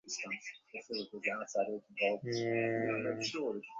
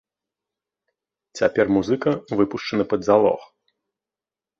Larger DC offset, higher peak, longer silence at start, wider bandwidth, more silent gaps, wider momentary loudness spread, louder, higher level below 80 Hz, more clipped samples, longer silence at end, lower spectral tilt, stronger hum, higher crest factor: neither; second, -20 dBFS vs -4 dBFS; second, 0.05 s vs 1.35 s; about the same, 7.6 kHz vs 7.6 kHz; neither; about the same, 8 LU vs 7 LU; second, -37 LUFS vs -21 LUFS; second, -78 dBFS vs -58 dBFS; neither; second, 0 s vs 1.15 s; second, -3.5 dB/octave vs -6.5 dB/octave; neither; about the same, 18 dB vs 20 dB